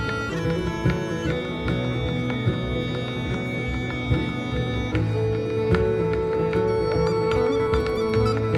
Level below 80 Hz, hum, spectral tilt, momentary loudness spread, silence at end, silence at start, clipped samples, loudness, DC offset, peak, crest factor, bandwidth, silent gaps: -36 dBFS; none; -7 dB/octave; 5 LU; 0 s; 0 s; under 0.1%; -24 LUFS; under 0.1%; -6 dBFS; 16 dB; 11.5 kHz; none